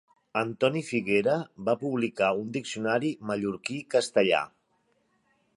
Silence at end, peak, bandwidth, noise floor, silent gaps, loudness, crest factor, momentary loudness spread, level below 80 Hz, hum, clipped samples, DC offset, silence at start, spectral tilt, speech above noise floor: 1.1 s; -10 dBFS; 11.5 kHz; -71 dBFS; none; -28 LUFS; 20 dB; 7 LU; -70 dBFS; none; under 0.1%; under 0.1%; 0.35 s; -5 dB/octave; 44 dB